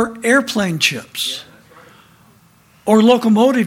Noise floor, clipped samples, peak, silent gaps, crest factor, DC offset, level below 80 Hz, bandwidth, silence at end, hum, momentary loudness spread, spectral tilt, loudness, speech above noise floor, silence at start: -51 dBFS; under 0.1%; 0 dBFS; none; 16 dB; under 0.1%; -58 dBFS; 16.5 kHz; 0 s; none; 11 LU; -4.5 dB/octave; -15 LUFS; 36 dB; 0 s